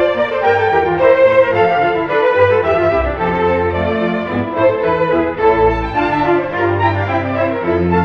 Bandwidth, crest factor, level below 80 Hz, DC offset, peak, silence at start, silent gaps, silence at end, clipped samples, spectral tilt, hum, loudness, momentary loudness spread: 6.4 kHz; 14 dB; -34 dBFS; under 0.1%; 0 dBFS; 0 s; none; 0 s; under 0.1%; -8 dB/octave; none; -14 LUFS; 5 LU